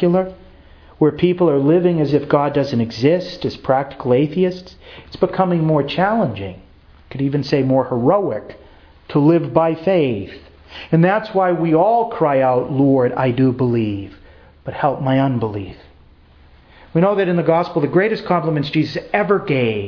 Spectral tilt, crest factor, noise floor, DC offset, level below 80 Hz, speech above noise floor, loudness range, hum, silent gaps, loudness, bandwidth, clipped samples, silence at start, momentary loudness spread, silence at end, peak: -9 dB/octave; 18 dB; -47 dBFS; under 0.1%; -48 dBFS; 30 dB; 4 LU; none; none; -17 LUFS; 5.4 kHz; under 0.1%; 0 s; 12 LU; 0 s; 0 dBFS